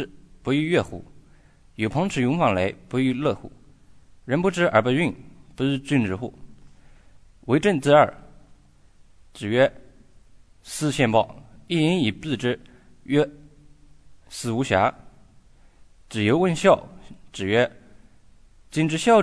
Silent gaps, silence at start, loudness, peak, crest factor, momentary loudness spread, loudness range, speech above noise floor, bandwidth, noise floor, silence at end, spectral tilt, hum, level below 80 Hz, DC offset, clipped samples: none; 0 s; -23 LUFS; -4 dBFS; 20 dB; 15 LU; 3 LU; 31 dB; 11 kHz; -53 dBFS; 0 s; -6 dB/octave; none; -52 dBFS; under 0.1%; under 0.1%